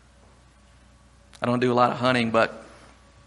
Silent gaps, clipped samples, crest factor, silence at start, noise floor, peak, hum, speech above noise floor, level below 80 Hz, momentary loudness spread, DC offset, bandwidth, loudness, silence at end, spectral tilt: none; under 0.1%; 22 dB; 1.4 s; -54 dBFS; -4 dBFS; none; 32 dB; -58 dBFS; 9 LU; under 0.1%; 11.5 kHz; -23 LUFS; 0.6 s; -6 dB/octave